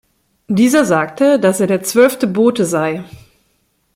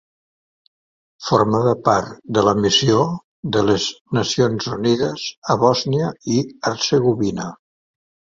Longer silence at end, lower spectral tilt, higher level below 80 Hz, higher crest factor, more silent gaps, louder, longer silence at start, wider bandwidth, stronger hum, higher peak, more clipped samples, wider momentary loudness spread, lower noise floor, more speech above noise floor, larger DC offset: first, 0.9 s vs 0.75 s; about the same, -5 dB/octave vs -5 dB/octave; about the same, -56 dBFS vs -52 dBFS; about the same, 14 dB vs 18 dB; second, none vs 3.24-3.43 s, 4.01-4.05 s, 5.38-5.42 s; first, -14 LUFS vs -19 LUFS; second, 0.5 s vs 1.2 s; first, 16.5 kHz vs 7.8 kHz; neither; about the same, -2 dBFS vs -2 dBFS; neither; about the same, 7 LU vs 8 LU; second, -62 dBFS vs under -90 dBFS; second, 49 dB vs over 72 dB; neither